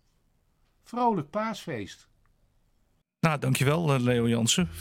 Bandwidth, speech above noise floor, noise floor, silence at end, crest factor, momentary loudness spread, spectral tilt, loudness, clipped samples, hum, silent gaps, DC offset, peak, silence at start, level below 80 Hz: 16.5 kHz; 44 dB; -70 dBFS; 0 s; 20 dB; 13 LU; -5 dB/octave; -26 LUFS; under 0.1%; none; none; under 0.1%; -8 dBFS; 0.95 s; -58 dBFS